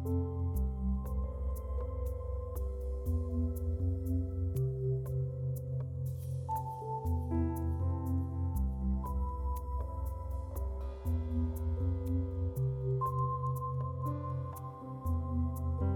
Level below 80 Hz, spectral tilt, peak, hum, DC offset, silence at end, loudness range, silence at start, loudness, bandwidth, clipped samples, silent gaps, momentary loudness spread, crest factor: -40 dBFS; -10 dB/octave; -22 dBFS; none; under 0.1%; 0 s; 2 LU; 0 s; -37 LUFS; 17.5 kHz; under 0.1%; none; 5 LU; 12 dB